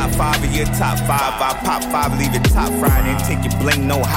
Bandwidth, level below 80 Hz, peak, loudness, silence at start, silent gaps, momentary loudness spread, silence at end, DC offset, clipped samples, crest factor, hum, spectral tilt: 17 kHz; -24 dBFS; -6 dBFS; -17 LUFS; 0 s; none; 3 LU; 0 s; under 0.1%; under 0.1%; 10 dB; none; -5 dB/octave